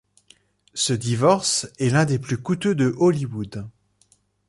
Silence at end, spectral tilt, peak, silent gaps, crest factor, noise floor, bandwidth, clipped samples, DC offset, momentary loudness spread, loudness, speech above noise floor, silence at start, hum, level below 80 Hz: 0.8 s; -5 dB/octave; -4 dBFS; none; 18 dB; -62 dBFS; 11.5 kHz; under 0.1%; under 0.1%; 14 LU; -21 LUFS; 41 dB; 0.75 s; 50 Hz at -45 dBFS; -56 dBFS